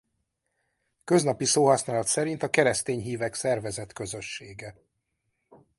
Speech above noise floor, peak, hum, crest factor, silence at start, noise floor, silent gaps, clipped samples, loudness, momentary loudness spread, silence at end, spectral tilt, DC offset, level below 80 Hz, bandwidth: 52 dB; -6 dBFS; none; 22 dB; 1.05 s; -78 dBFS; none; under 0.1%; -26 LUFS; 16 LU; 0.25 s; -4 dB/octave; under 0.1%; -62 dBFS; 12 kHz